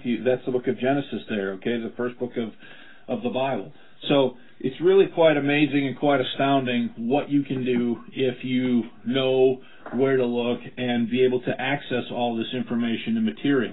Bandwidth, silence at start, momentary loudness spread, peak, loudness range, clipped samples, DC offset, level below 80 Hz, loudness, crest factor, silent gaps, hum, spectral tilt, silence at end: 4.1 kHz; 0.05 s; 10 LU; -6 dBFS; 6 LU; under 0.1%; 0.6%; -66 dBFS; -24 LUFS; 16 dB; none; none; -10.5 dB/octave; 0 s